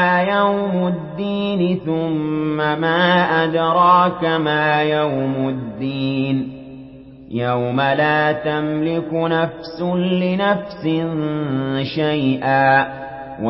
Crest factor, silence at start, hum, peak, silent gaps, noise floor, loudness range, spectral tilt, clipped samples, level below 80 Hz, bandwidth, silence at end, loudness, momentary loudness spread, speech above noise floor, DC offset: 16 dB; 0 s; none; -2 dBFS; none; -39 dBFS; 4 LU; -11 dB/octave; under 0.1%; -52 dBFS; 5.8 kHz; 0 s; -18 LUFS; 9 LU; 21 dB; under 0.1%